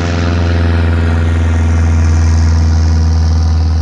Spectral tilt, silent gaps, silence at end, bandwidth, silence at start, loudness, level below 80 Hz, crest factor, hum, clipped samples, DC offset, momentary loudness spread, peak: -7 dB/octave; none; 0 s; 7.4 kHz; 0 s; -12 LUFS; -18 dBFS; 8 dB; none; under 0.1%; under 0.1%; 2 LU; -2 dBFS